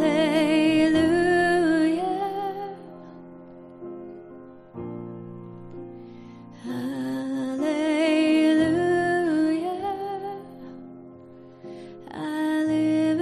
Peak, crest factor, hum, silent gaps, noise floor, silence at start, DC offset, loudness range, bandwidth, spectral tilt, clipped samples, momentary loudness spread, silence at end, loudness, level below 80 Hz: -10 dBFS; 16 dB; none; none; -46 dBFS; 0 s; under 0.1%; 17 LU; 12 kHz; -5.5 dB/octave; under 0.1%; 23 LU; 0 s; -23 LUFS; -58 dBFS